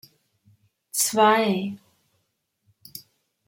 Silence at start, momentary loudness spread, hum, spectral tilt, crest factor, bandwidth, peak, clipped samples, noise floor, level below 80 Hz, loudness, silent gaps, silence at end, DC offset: 0.95 s; 24 LU; none; -3 dB/octave; 20 dB; 16.5 kHz; -6 dBFS; under 0.1%; -75 dBFS; -74 dBFS; -21 LUFS; none; 0.5 s; under 0.1%